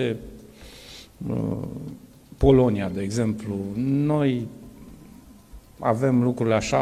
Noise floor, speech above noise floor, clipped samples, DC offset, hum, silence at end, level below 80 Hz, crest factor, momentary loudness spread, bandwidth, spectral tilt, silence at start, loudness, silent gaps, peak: -47 dBFS; 25 dB; under 0.1%; under 0.1%; none; 0 s; -42 dBFS; 20 dB; 25 LU; 14.5 kHz; -7 dB/octave; 0 s; -24 LUFS; none; -4 dBFS